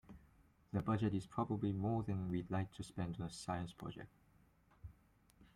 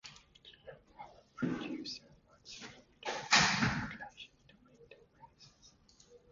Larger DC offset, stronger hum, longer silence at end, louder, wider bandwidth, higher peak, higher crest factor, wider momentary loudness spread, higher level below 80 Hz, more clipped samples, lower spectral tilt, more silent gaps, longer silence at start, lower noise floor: neither; neither; about the same, 0.1 s vs 0.15 s; second, -42 LUFS vs -33 LUFS; first, 12 kHz vs 7.4 kHz; second, -26 dBFS vs -12 dBFS; second, 18 dB vs 28 dB; second, 22 LU vs 28 LU; about the same, -66 dBFS vs -62 dBFS; neither; first, -7.5 dB/octave vs -2 dB/octave; neither; about the same, 0.1 s vs 0.05 s; first, -71 dBFS vs -65 dBFS